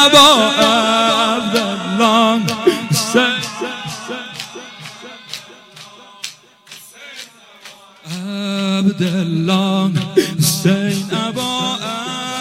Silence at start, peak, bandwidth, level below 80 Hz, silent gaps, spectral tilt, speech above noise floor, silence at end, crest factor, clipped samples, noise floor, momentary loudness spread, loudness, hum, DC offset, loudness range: 0 s; 0 dBFS; 16.5 kHz; -56 dBFS; none; -4 dB/octave; 27 dB; 0 s; 16 dB; under 0.1%; -41 dBFS; 20 LU; -15 LUFS; none; under 0.1%; 18 LU